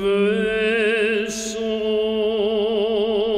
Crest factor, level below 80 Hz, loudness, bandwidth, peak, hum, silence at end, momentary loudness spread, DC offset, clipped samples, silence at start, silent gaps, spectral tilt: 10 dB; -50 dBFS; -20 LUFS; 12 kHz; -10 dBFS; none; 0 s; 5 LU; under 0.1%; under 0.1%; 0 s; none; -4 dB/octave